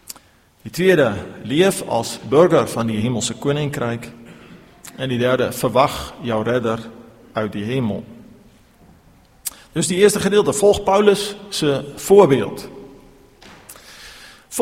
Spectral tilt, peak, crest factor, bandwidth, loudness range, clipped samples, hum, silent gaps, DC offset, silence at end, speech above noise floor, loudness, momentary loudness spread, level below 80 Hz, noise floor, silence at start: -5 dB/octave; 0 dBFS; 20 dB; 16.5 kHz; 8 LU; under 0.1%; none; none; under 0.1%; 0 s; 33 dB; -18 LUFS; 21 LU; -50 dBFS; -51 dBFS; 0.1 s